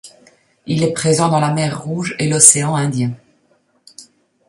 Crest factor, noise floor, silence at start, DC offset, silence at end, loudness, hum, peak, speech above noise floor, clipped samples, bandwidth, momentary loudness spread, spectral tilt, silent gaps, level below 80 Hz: 18 dB; -59 dBFS; 0.05 s; under 0.1%; 0.45 s; -14 LUFS; 50 Hz at -35 dBFS; 0 dBFS; 44 dB; 0.2%; 16 kHz; 14 LU; -4 dB/octave; none; -56 dBFS